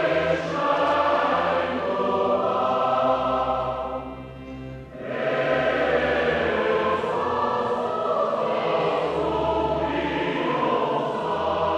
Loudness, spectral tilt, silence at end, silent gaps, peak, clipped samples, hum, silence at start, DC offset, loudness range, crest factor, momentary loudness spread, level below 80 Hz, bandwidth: -23 LUFS; -6 dB/octave; 0 s; none; -8 dBFS; under 0.1%; none; 0 s; under 0.1%; 3 LU; 14 dB; 8 LU; -48 dBFS; 9.4 kHz